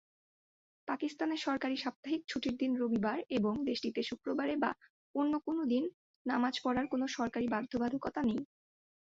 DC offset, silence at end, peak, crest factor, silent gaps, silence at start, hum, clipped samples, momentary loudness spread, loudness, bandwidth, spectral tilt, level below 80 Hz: under 0.1%; 0.55 s; -18 dBFS; 18 dB; 1.96-2.03 s, 4.90-5.14 s, 5.94-6.25 s; 0.85 s; none; under 0.1%; 6 LU; -35 LUFS; 7.6 kHz; -3.5 dB/octave; -68 dBFS